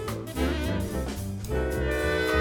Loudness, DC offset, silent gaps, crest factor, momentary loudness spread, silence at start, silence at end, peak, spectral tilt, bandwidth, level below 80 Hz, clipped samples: -29 LUFS; under 0.1%; none; 16 dB; 7 LU; 0 s; 0 s; -10 dBFS; -5.5 dB/octave; 19.5 kHz; -34 dBFS; under 0.1%